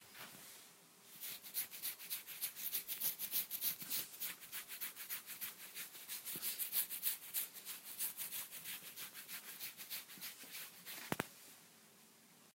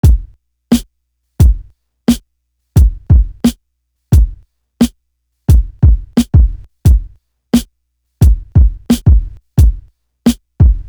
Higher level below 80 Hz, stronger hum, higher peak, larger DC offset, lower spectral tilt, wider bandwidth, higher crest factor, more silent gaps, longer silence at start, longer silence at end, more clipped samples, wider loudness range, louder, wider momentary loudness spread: second, -88 dBFS vs -14 dBFS; neither; second, -20 dBFS vs 0 dBFS; neither; second, -0.5 dB/octave vs -7 dB/octave; second, 16 kHz vs over 20 kHz; first, 28 dB vs 12 dB; neither; about the same, 0 s vs 0.05 s; about the same, 0.05 s vs 0 s; neither; first, 6 LU vs 2 LU; second, -43 LUFS vs -13 LUFS; first, 19 LU vs 6 LU